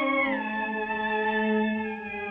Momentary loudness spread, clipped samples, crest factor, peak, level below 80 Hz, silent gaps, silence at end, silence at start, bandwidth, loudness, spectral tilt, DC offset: 6 LU; under 0.1%; 14 dB; -14 dBFS; -62 dBFS; none; 0 s; 0 s; 4.7 kHz; -27 LUFS; -8 dB/octave; under 0.1%